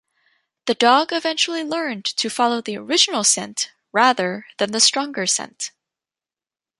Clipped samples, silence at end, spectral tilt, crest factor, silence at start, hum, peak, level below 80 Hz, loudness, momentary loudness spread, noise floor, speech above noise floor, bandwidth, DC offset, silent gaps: under 0.1%; 1.1 s; -1 dB/octave; 22 dB; 0.65 s; none; 0 dBFS; -74 dBFS; -19 LUFS; 11 LU; under -90 dBFS; over 70 dB; 11.5 kHz; under 0.1%; none